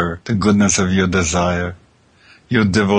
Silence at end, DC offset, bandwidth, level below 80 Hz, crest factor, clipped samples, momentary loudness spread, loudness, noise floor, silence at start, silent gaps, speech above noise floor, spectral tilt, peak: 0 s; under 0.1%; 10 kHz; -38 dBFS; 14 dB; under 0.1%; 6 LU; -16 LUFS; -51 dBFS; 0 s; none; 36 dB; -5 dB/octave; -2 dBFS